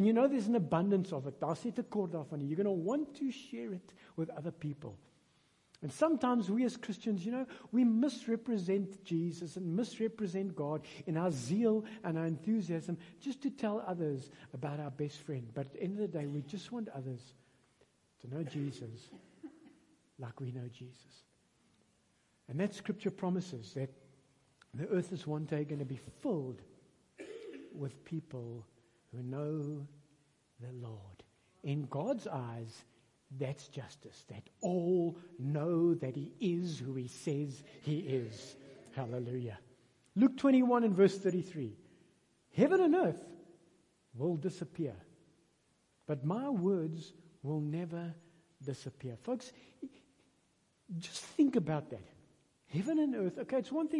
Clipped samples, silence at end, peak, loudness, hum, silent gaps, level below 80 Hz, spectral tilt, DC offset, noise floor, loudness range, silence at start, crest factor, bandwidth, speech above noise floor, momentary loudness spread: under 0.1%; 0 s; -16 dBFS; -36 LUFS; none; none; -80 dBFS; -7.5 dB/octave; under 0.1%; -74 dBFS; 12 LU; 0 s; 22 dB; 11.5 kHz; 38 dB; 19 LU